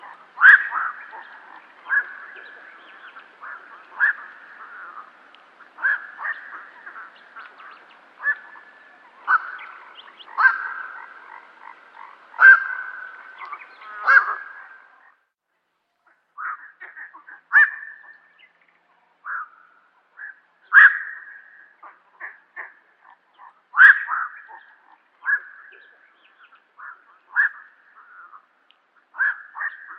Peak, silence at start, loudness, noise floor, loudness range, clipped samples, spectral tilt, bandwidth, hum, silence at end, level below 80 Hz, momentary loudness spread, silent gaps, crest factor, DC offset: 0 dBFS; 0.05 s; -17 LUFS; -74 dBFS; 12 LU; under 0.1%; 0 dB/octave; 5.8 kHz; none; 0.05 s; under -90 dBFS; 30 LU; none; 22 dB; under 0.1%